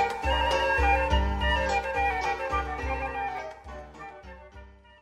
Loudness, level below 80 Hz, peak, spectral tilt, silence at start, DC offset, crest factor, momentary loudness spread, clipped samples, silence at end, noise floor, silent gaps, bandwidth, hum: -27 LUFS; -34 dBFS; -12 dBFS; -5 dB/octave; 0 s; under 0.1%; 16 dB; 20 LU; under 0.1%; 0.3 s; -49 dBFS; none; 12 kHz; none